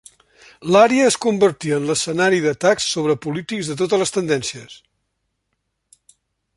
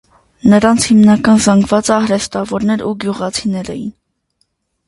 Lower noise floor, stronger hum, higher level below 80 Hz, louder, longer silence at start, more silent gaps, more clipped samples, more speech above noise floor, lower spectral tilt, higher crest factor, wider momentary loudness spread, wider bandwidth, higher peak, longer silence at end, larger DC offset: first, -74 dBFS vs -64 dBFS; neither; second, -60 dBFS vs -44 dBFS; second, -18 LUFS vs -12 LUFS; first, 0.6 s vs 0.45 s; neither; neither; first, 56 dB vs 52 dB; about the same, -4 dB/octave vs -5 dB/octave; about the same, 18 dB vs 14 dB; about the same, 11 LU vs 12 LU; about the same, 11.5 kHz vs 11.5 kHz; about the same, -2 dBFS vs 0 dBFS; first, 1.8 s vs 0.95 s; neither